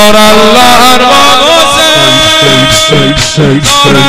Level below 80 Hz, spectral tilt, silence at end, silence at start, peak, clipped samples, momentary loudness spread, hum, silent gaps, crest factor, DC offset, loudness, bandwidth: -26 dBFS; -3 dB/octave; 0 s; 0 s; 0 dBFS; 20%; 4 LU; none; none; 4 dB; under 0.1%; -3 LUFS; over 20 kHz